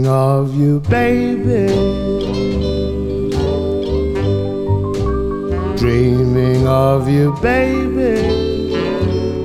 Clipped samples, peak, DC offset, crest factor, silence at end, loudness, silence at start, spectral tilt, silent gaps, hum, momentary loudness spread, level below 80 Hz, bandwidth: under 0.1%; 0 dBFS; under 0.1%; 14 dB; 0 s; -16 LUFS; 0 s; -8 dB/octave; none; none; 5 LU; -28 dBFS; 14 kHz